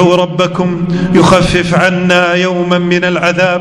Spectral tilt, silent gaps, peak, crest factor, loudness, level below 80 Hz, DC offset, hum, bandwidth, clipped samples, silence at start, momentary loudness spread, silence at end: -5.5 dB/octave; none; 0 dBFS; 10 dB; -10 LUFS; -34 dBFS; under 0.1%; none; 11 kHz; 1%; 0 s; 5 LU; 0 s